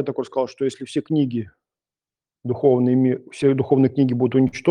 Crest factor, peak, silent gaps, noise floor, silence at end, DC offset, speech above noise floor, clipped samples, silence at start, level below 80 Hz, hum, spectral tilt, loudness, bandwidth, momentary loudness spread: 16 dB; -4 dBFS; none; under -90 dBFS; 0 s; under 0.1%; over 71 dB; under 0.1%; 0 s; -60 dBFS; none; -8 dB/octave; -20 LUFS; 10 kHz; 11 LU